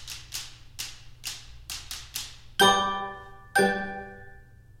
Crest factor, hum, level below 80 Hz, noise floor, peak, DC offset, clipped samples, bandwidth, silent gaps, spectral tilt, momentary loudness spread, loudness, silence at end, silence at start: 22 dB; none; -52 dBFS; -50 dBFS; -8 dBFS; under 0.1%; under 0.1%; 16.5 kHz; none; -2.5 dB/octave; 20 LU; -28 LUFS; 0.1 s; 0 s